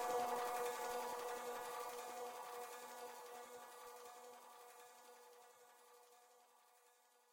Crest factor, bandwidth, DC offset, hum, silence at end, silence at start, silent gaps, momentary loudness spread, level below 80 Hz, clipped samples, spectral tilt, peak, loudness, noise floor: 18 dB; 17 kHz; under 0.1%; none; 0.4 s; 0 s; none; 23 LU; -88 dBFS; under 0.1%; -1 dB/octave; -30 dBFS; -48 LUFS; -73 dBFS